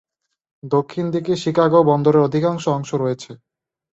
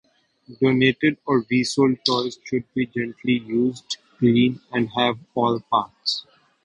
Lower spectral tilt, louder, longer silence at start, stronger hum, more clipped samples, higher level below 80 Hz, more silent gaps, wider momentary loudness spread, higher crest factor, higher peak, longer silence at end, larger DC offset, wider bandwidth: first, -7 dB/octave vs -5.5 dB/octave; first, -18 LUFS vs -22 LUFS; first, 0.65 s vs 0.5 s; neither; neither; about the same, -60 dBFS vs -58 dBFS; neither; about the same, 9 LU vs 8 LU; second, 16 dB vs 22 dB; about the same, -2 dBFS vs 0 dBFS; first, 0.65 s vs 0.45 s; neither; second, 8 kHz vs 11 kHz